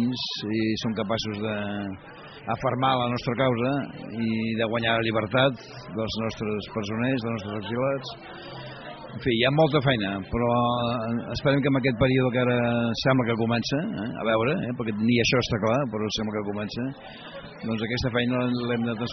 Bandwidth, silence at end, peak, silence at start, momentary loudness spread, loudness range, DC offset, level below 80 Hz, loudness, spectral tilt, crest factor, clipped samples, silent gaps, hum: 6.4 kHz; 0 s; -8 dBFS; 0 s; 14 LU; 4 LU; under 0.1%; -52 dBFS; -25 LUFS; -4.5 dB/octave; 18 dB; under 0.1%; none; none